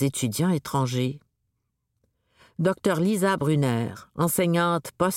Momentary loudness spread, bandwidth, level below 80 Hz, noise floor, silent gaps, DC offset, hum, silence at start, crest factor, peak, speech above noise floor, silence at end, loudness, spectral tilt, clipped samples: 7 LU; 17 kHz; -60 dBFS; -77 dBFS; none; under 0.1%; none; 0 s; 16 dB; -10 dBFS; 53 dB; 0 s; -25 LUFS; -5.5 dB/octave; under 0.1%